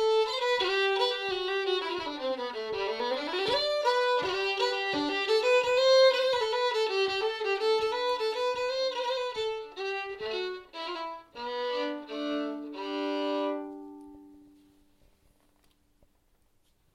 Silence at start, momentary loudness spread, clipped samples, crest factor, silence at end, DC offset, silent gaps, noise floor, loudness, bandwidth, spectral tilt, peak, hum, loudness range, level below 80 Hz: 0 s; 12 LU; under 0.1%; 18 dB; 2.55 s; under 0.1%; none; -68 dBFS; -29 LUFS; 12.5 kHz; -2.5 dB/octave; -12 dBFS; none; 10 LU; -66 dBFS